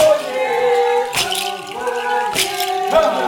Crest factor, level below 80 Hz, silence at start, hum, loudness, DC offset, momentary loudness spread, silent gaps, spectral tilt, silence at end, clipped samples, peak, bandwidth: 14 dB; -52 dBFS; 0 s; none; -17 LUFS; under 0.1%; 7 LU; none; -1.5 dB/octave; 0 s; under 0.1%; -2 dBFS; 19 kHz